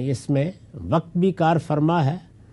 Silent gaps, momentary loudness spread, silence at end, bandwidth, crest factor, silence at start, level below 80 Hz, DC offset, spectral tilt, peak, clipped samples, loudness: none; 9 LU; 0.3 s; 11.5 kHz; 16 dB; 0 s; -54 dBFS; under 0.1%; -8 dB/octave; -6 dBFS; under 0.1%; -22 LUFS